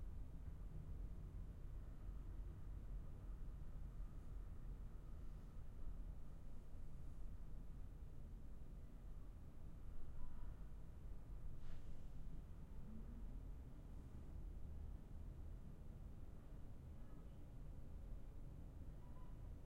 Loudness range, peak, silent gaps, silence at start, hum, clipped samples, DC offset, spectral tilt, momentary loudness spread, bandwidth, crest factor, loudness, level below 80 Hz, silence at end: 3 LU; -36 dBFS; none; 0 s; none; under 0.1%; under 0.1%; -8 dB/octave; 4 LU; 7 kHz; 16 dB; -58 LUFS; -54 dBFS; 0 s